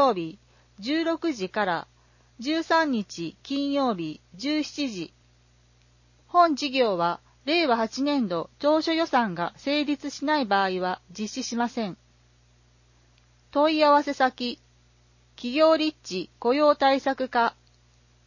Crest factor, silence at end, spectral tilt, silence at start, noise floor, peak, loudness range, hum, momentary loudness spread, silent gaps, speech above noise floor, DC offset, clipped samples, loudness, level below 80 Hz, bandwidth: 18 dB; 0.75 s; -4.5 dB/octave; 0 s; -60 dBFS; -8 dBFS; 5 LU; 60 Hz at -55 dBFS; 13 LU; none; 35 dB; under 0.1%; under 0.1%; -25 LUFS; -64 dBFS; 7.4 kHz